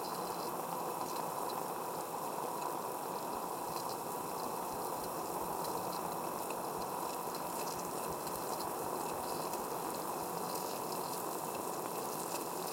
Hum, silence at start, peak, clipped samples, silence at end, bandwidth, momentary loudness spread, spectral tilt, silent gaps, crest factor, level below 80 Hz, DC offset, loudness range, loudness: none; 0 s; -22 dBFS; under 0.1%; 0 s; 17 kHz; 1 LU; -3.5 dB/octave; none; 16 dB; -72 dBFS; under 0.1%; 1 LU; -39 LUFS